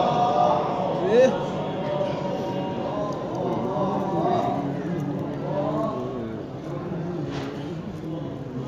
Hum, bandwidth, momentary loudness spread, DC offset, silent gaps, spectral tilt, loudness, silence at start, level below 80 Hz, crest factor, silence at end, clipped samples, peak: none; 7.8 kHz; 12 LU; under 0.1%; none; -7.5 dB/octave; -26 LUFS; 0 s; -54 dBFS; 18 dB; 0 s; under 0.1%; -8 dBFS